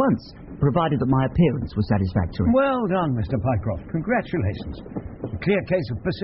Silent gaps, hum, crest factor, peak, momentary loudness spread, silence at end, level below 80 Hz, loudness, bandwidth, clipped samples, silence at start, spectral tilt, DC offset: none; none; 16 dB; -8 dBFS; 13 LU; 0 s; -40 dBFS; -23 LUFS; 5.8 kHz; under 0.1%; 0 s; -7 dB/octave; under 0.1%